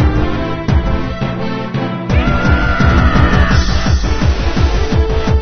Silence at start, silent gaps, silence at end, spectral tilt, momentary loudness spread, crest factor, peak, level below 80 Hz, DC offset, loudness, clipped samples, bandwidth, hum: 0 s; none; 0 s; -6.5 dB/octave; 8 LU; 12 dB; 0 dBFS; -16 dBFS; under 0.1%; -14 LUFS; under 0.1%; 6.6 kHz; none